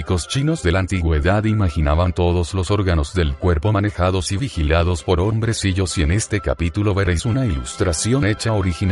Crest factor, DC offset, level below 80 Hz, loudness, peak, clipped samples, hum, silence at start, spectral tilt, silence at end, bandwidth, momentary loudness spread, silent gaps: 14 dB; under 0.1%; -26 dBFS; -19 LUFS; -4 dBFS; under 0.1%; none; 0 s; -5.5 dB/octave; 0 s; 11.5 kHz; 3 LU; none